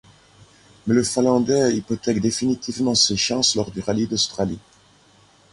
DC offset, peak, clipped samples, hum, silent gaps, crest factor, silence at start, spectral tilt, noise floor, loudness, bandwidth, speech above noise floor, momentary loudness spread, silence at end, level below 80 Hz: under 0.1%; -4 dBFS; under 0.1%; 50 Hz at -45 dBFS; none; 18 dB; 0.85 s; -4 dB/octave; -54 dBFS; -20 LUFS; 11.5 kHz; 34 dB; 7 LU; 0.95 s; -52 dBFS